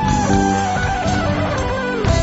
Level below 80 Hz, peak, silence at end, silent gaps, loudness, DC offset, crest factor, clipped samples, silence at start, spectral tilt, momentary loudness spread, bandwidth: -28 dBFS; -4 dBFS; 0 s; none; -18 LUFS; under 0.1%; 14 dB; under 0.1%; 0 s; -5 dB/octave; 4 LU; 8 kHz